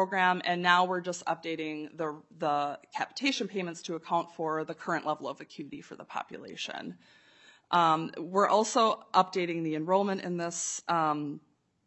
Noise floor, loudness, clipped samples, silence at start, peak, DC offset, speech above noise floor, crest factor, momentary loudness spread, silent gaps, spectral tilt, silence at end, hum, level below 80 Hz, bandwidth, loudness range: -60 dBFS; -30 LUFS; under 0.1%; 0 s; -8 dBFS; under 0.1%; 29 dB; 22 dB; 15 LU; none; -3.5 dB/octave; 0.5 s; none; -82 dBFS; 8.2 kHz; 8 LU